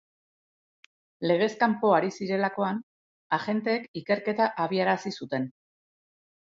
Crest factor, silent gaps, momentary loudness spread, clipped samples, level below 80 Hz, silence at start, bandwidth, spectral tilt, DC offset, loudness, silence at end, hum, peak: 20 dB; 2.83-3.30 s, 3.88-3.94 s; 9 LU; under 0.1%; -76 dBFS; 1.2 s; 7.8 kHz; -6 dB/octave; under 0.1%; -27 LUFS; 1 s; none; -8 dBFS